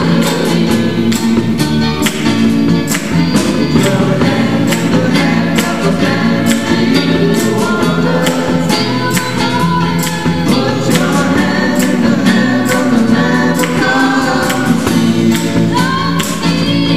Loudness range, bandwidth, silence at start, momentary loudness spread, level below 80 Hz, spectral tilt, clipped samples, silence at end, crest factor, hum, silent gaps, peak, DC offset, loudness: 1 LU; 16 kHz; 0 s; 2 LU; -36 dBFS; -5 dB/octave; under 0.1%; 0 s; 12 dB; none; none; 0 dBFS; 3%; -12 LUFS